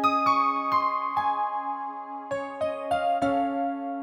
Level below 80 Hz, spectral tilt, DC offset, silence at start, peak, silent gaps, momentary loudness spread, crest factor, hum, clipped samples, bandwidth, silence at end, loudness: -64 dBFS; -5.5 dB/octave; under 0.1%; 0 s; -12 dBFS; none; 11 LU; 16 dB; none; under 0.1%; 16.5 kHz; 0 s; -27 LUFS